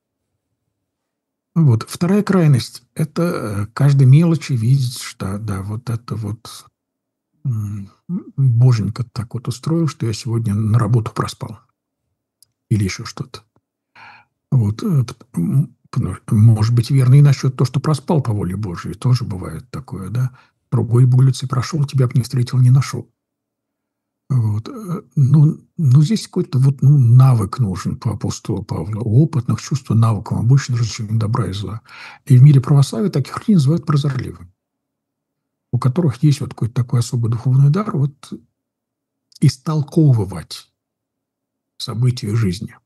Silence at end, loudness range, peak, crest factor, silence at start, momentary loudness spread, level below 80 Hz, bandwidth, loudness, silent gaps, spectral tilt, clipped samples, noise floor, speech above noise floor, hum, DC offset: 0.15 s; 6 LU; 0 dBFS; 16 dB; 1.55 s; 15 LU; -52 dBFS; 12.5 kHz; -17 LUFS; none; -7.5 dB/octave; under 0.1%; -79 dBFS; 63 dB; none; under 0.1%